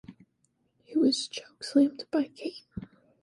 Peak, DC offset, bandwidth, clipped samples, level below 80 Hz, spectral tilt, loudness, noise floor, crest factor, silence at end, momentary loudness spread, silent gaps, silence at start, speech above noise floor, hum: -12 dBFS; under 0.1%; 11.5 kHz; under 0.1%; -64 dBFS; -4.5 dB/octave; -29 LUFS; -74 dBFS; 18 dB; 0.4 s; 18 LU; none; 0.1 s; 45 dB; none